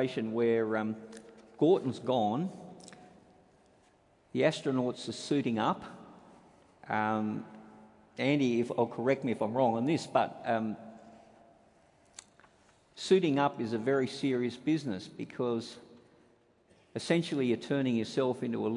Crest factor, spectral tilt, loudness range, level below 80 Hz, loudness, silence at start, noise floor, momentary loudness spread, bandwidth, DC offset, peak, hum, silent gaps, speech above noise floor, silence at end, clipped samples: 20 dB; -6 dB/octave; 4 LU; -76 dBFS; -31 LUFS; 0 s; -66 dBFS; 21 LU; 11 kHz; under 0.1%; -12 dBFS; none; none; 35 dB; 0 s; under 0.1%